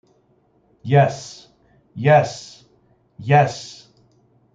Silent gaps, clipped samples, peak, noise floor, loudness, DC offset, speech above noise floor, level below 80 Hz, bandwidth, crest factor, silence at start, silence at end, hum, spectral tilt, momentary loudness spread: none; under 0.1%; -2 dBFS; -60 dBFS; -18 LUFS; under 0.1%; 43 dB; -62 dBFS; 7.8 kHz; 20 dB; 0.85 s; 0.85 s; none; -6.5 dB/octave; 22 LU